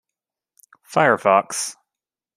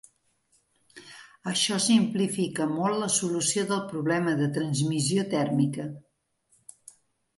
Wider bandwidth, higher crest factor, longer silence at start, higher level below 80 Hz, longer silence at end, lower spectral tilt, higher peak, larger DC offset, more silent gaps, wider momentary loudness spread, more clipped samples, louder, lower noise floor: first, 15 kHz vs 11.5 kHz; about the same, 20 dB vs 18 dB; about the same, 0.9 s vs 0.95 s; about the same, -70 dBFS vs -70 dBFS; second, 0.65 s vs 1.4 s; about the same, -3.5 dB/octave vs -4 dB/octave; first, -2 dBFS vs -10 dBFS; neither; neither; second, 10 LU vs 15 LU; neither; first, -19 LUFS vs -26 LUFS; first, -88 dBFS vs -69 dBFS